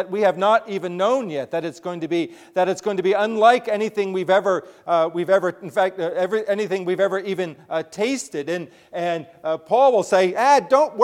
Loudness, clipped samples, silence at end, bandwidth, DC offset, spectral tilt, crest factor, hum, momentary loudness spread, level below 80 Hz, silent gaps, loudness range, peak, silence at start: -21 LUFS; under 0.1%; 0 s; 14 kHz; under 0.1%; -5 dB/octave; 18 dB; none; 11 LU; -72 dBFS; none; 4 LU; -2 dBFS; 0 s